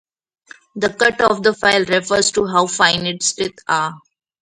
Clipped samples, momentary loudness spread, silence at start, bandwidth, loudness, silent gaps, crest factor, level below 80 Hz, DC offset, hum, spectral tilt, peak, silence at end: under 0.1%; 8 LU; 0.75 s; 11.5 kHz; -16 LUFS; none; 18 dB; -54 dBFS; under 0.1%; none; -2.5 dB/octave; 0 dBFS; 0.45 s